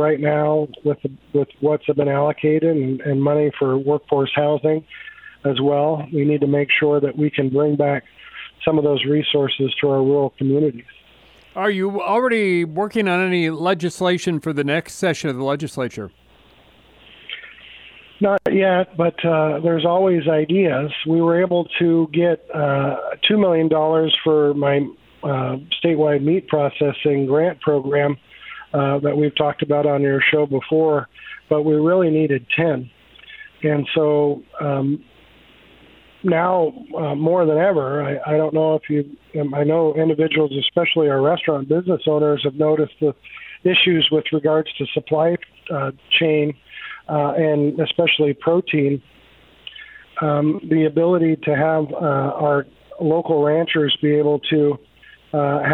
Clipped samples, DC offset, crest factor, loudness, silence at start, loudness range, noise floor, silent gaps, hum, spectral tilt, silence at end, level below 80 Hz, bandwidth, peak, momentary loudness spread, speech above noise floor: under 0.1%; under 0.1%; 16 dB; -19 LUFS; 0 s; 3 LU; -51 dBFS; none; none; -7 dB/octave; 0 s; -60 dBFS; 10.5 kHz; -2 dBFS; 9 LU; 33 dB